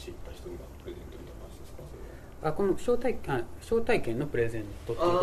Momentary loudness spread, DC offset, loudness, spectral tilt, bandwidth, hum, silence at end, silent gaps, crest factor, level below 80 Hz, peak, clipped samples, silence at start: 18 LU; under 0.1%; -31 LUFS; -6.5 dB/octave; 14 kHz; none; 0 s; none; 20 dB; -46 dBFS; -12 dBFS; under 0.1%; 0 s